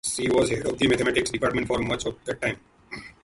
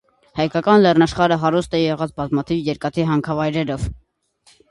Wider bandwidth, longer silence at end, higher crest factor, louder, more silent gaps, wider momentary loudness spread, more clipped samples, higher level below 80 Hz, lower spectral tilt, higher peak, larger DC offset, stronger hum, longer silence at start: about the same, 11.5 kHz vs 11.5 kHz; second, 0.1 s vs 0.75 s; about the same, 18 dB vs 18 dB; second, -25 LUFS vs -19 LUFS; neither; first, 17 LU vs 10 LU; neither; second, -48 dBFS vs -42 dBFS; second, -4 dB/octave vs -7 dB/octave; second, -8 dBFS vs -2 dBFS; neither; neither; second, 0.05 s vs 0.35 s